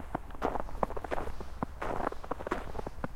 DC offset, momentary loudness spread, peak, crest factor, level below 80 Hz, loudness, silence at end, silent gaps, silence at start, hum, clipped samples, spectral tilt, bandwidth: under 0.1%; 5 LU; -10 dBFS; 24 dB; -44 dBFS; -38 LUFS; 0 s; none; 0 s; none; under 0.1%; -6.5 dB/octave; 15 kHz